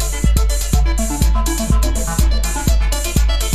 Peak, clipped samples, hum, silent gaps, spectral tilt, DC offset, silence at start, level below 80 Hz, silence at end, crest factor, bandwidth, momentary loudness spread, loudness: 0 dBFS; under 0.1%; none; none; -4.5 dB/octave; under 0.1%; 0 s; -16 dBFS; 0 s; 14 dB; 14.5 kHz; 1 LU; -17 LUFS